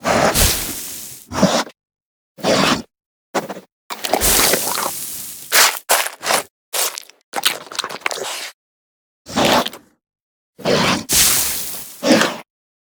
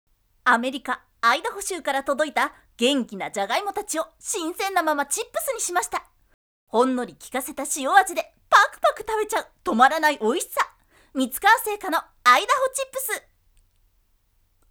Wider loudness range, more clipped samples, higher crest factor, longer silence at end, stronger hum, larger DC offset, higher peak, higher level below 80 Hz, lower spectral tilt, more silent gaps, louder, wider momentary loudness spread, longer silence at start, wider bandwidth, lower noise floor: about the same, 5 LU vs 5 LU; neither; about the same, 20 dB vs 24 dB; second, 0.4 s vs 1.5 s; neither; neither; about the same, 0 dBFS vs 0 dBFS; first, -38 dBFS vs -60 dBFS; about the same, -2 dB/octave vs -1.5 dB/octave; first, 2.02-2.35 s, 3.06-3.34 s, 3.72-3.90 s, 6.50-6.72 s, 7.24-7.32 s, 8.54-9.25 s, 10.20-10.53 s vs 6.34-6.67 s; first, -17 LUFS vs -23 LUFS; first, 15 LU vs 11 LU; second, 0 s vs 0.45 s; about the same, over 20 kHz vs over 20 kHz; first, under -90 dBFS vs -65 dBFS